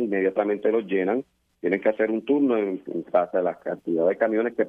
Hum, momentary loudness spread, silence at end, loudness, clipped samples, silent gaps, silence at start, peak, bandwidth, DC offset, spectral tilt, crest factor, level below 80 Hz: none; 6 LU; 0 s; -24 LUFS; under 0.1%; none; 0 s; -8 dBFS; 3.8 kHz; under 0.1%; -9 dB/octave; 16 dB; -72 dBFS